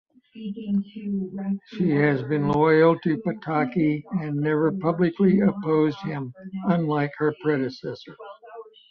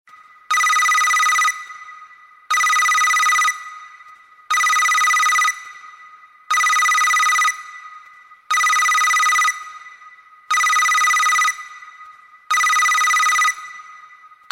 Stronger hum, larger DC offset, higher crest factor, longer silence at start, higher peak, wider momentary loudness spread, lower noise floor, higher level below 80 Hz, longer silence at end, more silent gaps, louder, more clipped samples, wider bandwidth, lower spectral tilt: neither; neither; about the same, 16 dB vs 12 dB; second, 0.35 s vs 0.5 s; about the same, -8 dBFS vs -6 dBFS; about the same, 16 LU vs 17 LU; about the same, -44 dBFS vs -45 dBFS; about the same, -62 dBFS vs -64 dBFS; second, 0.3 s vs 0.55 s; neither; second, -23 LUFS vs -15 LUFS; neither; second, 6.2 kHz vs 16.5 kHz; first, -9.5 dB/octave vs 5 dB/octave